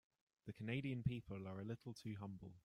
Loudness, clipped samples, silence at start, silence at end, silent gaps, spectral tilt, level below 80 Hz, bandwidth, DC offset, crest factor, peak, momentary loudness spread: -48 LUFS; under 0.1%; 0.45 s; 0.05 s; none; -7.5 dB/octave; -70 dBFS; 12 kHz; under 0.1%; 20 dB; -28 dBFS; 10 LU